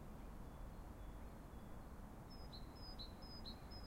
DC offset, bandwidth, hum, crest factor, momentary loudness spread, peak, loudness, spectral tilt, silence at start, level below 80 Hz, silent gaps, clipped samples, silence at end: under 0.1%; 16 kHz; none; 14 dB; 4 LU; -40 dBFS; -56 LUFS; -5.5 dB/octave; 0 s; -56 dBFS; none; under 0.1%; 0 s